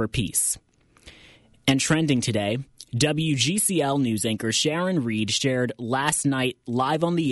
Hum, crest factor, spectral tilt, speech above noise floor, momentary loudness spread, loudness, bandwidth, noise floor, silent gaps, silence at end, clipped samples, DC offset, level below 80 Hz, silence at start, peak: none; 16 dB; -4 dB/octave; 30 dB; 5 LU; -23 LUFS; 12 kHz; -53 dBFS; none; 0 s; under 0.1%; under 0.1%; -52 dBFS; 0 s; -8 dBFS